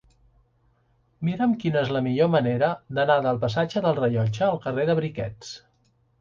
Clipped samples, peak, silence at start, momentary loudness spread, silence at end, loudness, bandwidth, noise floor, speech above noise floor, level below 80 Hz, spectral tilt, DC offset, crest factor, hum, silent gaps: under 0.1%; -6 dBFS; 1.2 s; 10 LU; 0.65 s; -24 LUFS; 7.6 kHz; -65 dBFS; 42 dB; -58 dBFS; -7.5 dB/octave; under 0.1%; 18 dB; none; none